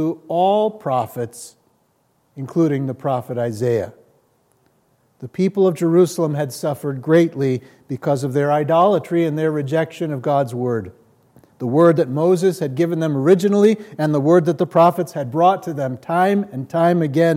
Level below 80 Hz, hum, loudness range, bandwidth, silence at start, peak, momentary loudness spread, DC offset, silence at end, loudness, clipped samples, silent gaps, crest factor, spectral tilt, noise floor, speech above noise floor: -70 dBFS; none; 7 LU; 16 kHz; 0 s; -2 dBFS; 10 LU; under 0.1%; 0 s; -18 LUFS; under 0.1%; none; 16 dB; -7.5 dB/octave; -63 dBFS; 45 dB